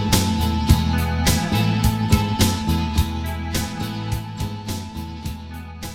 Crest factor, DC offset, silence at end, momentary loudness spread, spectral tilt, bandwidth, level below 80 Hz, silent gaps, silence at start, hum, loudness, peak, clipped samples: 20 dB; under 0.1%; 0 s; 13 LU; -5 dB/octave; 17 kHz; -28 dBFS; none; 0 s; none; -21 LUFS; -2 dBFS; under 0.1%